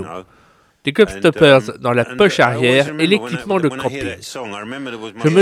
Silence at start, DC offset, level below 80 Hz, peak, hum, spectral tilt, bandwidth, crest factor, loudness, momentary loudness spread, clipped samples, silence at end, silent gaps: 0 s; under 0.1%; -50 dBFS; 0 dBFS; none; -5.5 dB/octave; 14.5 kHz; 16 dB; -15 LUFS; 16 LU; under 0.1%; 0 s; none